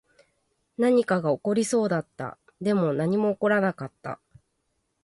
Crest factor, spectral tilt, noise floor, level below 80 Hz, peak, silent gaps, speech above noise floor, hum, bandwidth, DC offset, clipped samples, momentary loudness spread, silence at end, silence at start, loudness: 14 dB; -6 dB/octave; -75 dBFS; -68 dBFS; -12 dBFS; none; 51 dB; none; 11.5 kHz; under 0.1%; under 0.1%; 15 LU; 0.9 s; 0.8 s; -25 LUFS